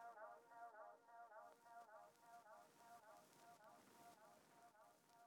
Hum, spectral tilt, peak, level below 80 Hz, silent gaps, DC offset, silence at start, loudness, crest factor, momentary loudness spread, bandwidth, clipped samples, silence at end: none; -3 dB/octave; -48 dBFS; under -90 dBFS; none; under 0.1%; 0 s; -65 LUFS; 18 dB; 6 LU; 18 kHz; under 0.1%; 0 s